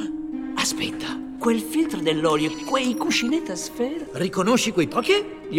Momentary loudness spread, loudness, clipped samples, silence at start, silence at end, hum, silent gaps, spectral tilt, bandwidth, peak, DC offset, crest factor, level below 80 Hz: 9 LU; -23 LUFS; under 0.1%; 0 s; 0 s; none; none; -3.5 dB/octave; 16.5 kHz; -6 dBFS; under 0.1%; 18 dB; -54 dBFS